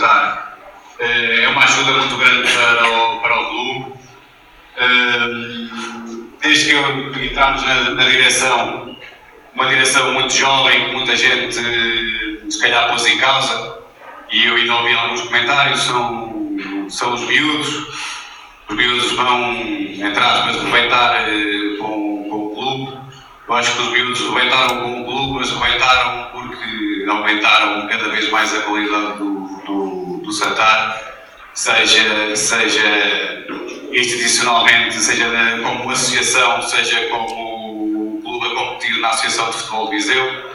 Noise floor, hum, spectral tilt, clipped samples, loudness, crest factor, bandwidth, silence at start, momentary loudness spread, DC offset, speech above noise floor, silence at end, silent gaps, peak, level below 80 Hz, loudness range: -44 dBFS; none; -1.5 dB/octave; under 0.1%; -14 LUFS; 16 dB; 16.5 kHz; 0 s; 14 LU; under 0.1%; 29 dB; 0 s; none; 0 dBFS; -46 dBFS; 4 LU